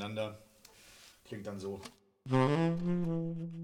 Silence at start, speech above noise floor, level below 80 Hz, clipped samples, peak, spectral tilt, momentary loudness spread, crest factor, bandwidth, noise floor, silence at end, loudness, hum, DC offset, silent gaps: 0 s; 26 dB; -62 dBFS; under 0.1%; -16 dBFS; -7.5 dB/octave; 25 LU; 20 dB; 13.5 kHz; -60 dBFS; 0 s; -35 LUFS; none; under 0.1%; none